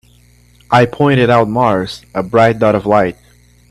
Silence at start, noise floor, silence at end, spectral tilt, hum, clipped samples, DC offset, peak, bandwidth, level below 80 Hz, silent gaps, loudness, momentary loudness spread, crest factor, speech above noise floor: 0.7 s; -47 dBFS; 0.55 s; -7 dB/octave; 60 Hz at -35 dBFS; under 0.1%; under 0.1%; 0 dBFS; 13 kHz; -44 dBFS; none; -13 LUFS; 8 LU; 14 dB; 35 dB